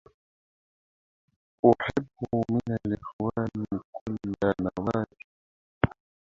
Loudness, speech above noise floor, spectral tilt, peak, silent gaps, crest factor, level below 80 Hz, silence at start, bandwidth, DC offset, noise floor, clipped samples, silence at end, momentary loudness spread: -29 LUFS; over 63 dB; -8.5 dB/octave; -2 dBFS; 3.13-3.19 s, 3.85-3.93 s, 4.01-4.06 s, 5.24-5.81 s; 28 dB; -52 dBFS; 1.65 s; 7.4 kHz; under 0.1%; under -90 dBFS; under 0.1%; 0.4 s; 12 LU